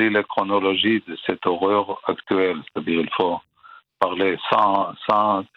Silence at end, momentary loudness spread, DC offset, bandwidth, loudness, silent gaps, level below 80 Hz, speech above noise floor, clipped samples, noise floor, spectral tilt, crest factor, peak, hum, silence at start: 0.15 s; 7 LU; under 0.1%; 6.2 kHz; -21 LUFS; none; -66 dBFS; 28 dB; under 0.1%; -49 dBFS; -7 dB/octave; 22 dB; 0 dBFS; none; 0 s